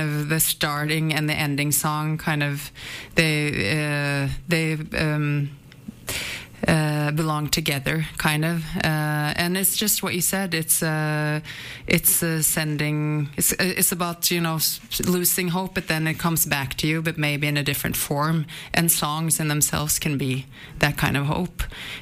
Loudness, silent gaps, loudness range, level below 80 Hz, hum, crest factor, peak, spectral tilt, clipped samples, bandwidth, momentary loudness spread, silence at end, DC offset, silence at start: -22 LUFS; none; 3 LU; -44 dBFS; none; 18 dB; -6 dBFS; -3.5 dB/octave; under 0.1%; 15.5 kHz; 7 LU; 0 s; under 0.1%; 0 s